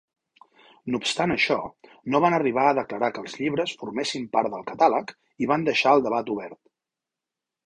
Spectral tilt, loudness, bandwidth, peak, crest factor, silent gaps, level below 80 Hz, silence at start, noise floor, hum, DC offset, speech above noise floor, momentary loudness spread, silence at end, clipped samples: -4.5 dB/octave; -24 LUFS; 11 kHz; -6 dBFS; 20 dB; none; -64 dBFS; 0.85 s; -88 dBFS; none; under 0.1%; 64 dB; 11 LU; 1.1 s; under 0.1%